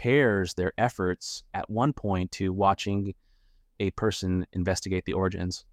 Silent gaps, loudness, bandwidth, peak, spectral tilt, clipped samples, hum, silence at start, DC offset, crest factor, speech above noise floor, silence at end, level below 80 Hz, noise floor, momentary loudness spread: none; -28 LUFS; 14.5 kHz; -10 dBFS; -5.5 dB/octave; under 0.1%; none; 0 s; under 0.1%; 18 dB; 35 dB; 0.1 s; -50 dBFS; -62 dBFS; 8 LU